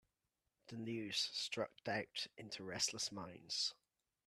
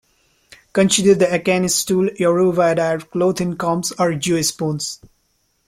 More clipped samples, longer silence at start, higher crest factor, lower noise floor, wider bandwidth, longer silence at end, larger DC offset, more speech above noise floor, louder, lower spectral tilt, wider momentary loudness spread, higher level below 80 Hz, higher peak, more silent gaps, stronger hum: neither; about the same, 0.65 s vs 0.75 s; first, 22 dB vs 16 dB; first, -89 dBFS vs -65 dBFS; second, 13.5 kHz vs 16.5 kHz; second, 0.55 s vs 0.75 s; neither; about the same, 45 dB vs 48 dB; second, -42 LUFS vs -17 LUFS; second, -2 dB/octave vs -4.5 dB/octave; about the same, 10 LU vs 9 LU; second, -82 dBFS vs -54 dBFS; second, -24 dBFS vs -2 dBFS; neither; neither